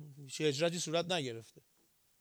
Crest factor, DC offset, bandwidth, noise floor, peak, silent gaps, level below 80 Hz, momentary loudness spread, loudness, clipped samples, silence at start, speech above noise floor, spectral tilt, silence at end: 18 dB; under 0.1%; over 20 kHz; -72 dBFS; -20 dBFS; none; -84 dBFS; 12 LU; -35 LUFS; under 0.1%; 0 s; 37 dB; -4 dB/octave; 0.6 s